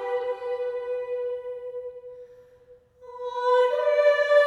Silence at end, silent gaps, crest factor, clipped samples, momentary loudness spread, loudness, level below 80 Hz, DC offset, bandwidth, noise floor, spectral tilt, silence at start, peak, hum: 0 s; none; 16 dB; under 0.1%; 21 LU; -25 LUFS; -70 dBFS; under 0.1%; 8.4 kHz; -54 dBFS; -1.5 dB/octave; 0 s; -8 dBFS; none